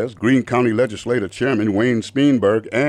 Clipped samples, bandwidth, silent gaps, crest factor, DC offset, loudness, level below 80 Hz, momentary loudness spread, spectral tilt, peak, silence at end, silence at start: under 0.1%; 11 kHz; none; 12 dB; under 0.1%; -18 LUFS; -56 dBFS; 5 LU; -6.5 dB/octave; -6 dBFS; 0 s; 0 s